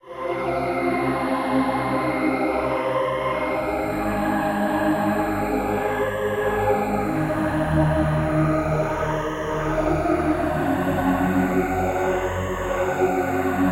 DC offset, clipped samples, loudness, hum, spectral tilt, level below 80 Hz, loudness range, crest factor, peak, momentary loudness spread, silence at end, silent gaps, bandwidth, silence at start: under 0.1%; under 0.1%; -23 LUFS; none; -7 dB/octave; -38 dBFS; 1 LU; 14 dB; -8 dBFS; 4 LU; 0 s; none; 16 kHz; 0.05 s